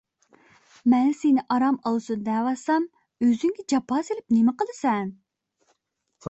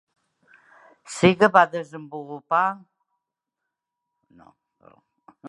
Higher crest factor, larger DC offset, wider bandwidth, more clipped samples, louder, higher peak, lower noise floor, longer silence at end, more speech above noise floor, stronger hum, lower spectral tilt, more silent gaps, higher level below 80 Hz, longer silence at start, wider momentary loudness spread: second, 16 dB vs 24 dB; neither; second, 8.2 kHz vs 11.5 kHz; neither; second, -24 LUFS vs -20 LUFS; second, -10 dBFS vs -2 dBFS; second, -74 dBFS vs -84 dBFS; about the same, 0 s vs 0 s; second, 51 dB vs 63 dB; neither; about the same, -6 dB/octave vs -5.5 dB/octave; neither; about the same, -68 dBFS vs -64 dBFS; second, 0.85 s vs 1.1 s; second, 6 LU vs 20 LU